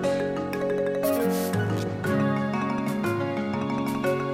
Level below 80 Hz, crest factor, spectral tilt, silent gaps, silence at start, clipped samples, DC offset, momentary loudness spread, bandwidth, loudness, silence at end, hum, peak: -58 dBFS; 14 dB; -6.5 dB/octave; none; 0 s; under 0.1%; under 0.1%; 3 LU; 17 kHz; -26 LUFS; 0 s; none; -12 dBFS